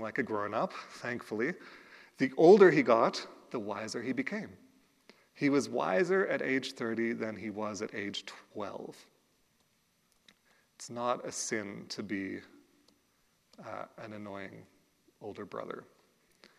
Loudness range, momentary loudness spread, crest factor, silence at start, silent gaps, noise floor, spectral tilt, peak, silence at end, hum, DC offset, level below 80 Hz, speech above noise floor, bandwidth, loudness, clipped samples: 18 LU; 20 LU; 24 dB; 0 s; none; -73 dBFS; -5 dB/octave; -8 dBFS; 0.75 s; none; under 0.1%; -82 dBFS; 42 dB; 12.5 kHz; -31 LUFS; under 0.1%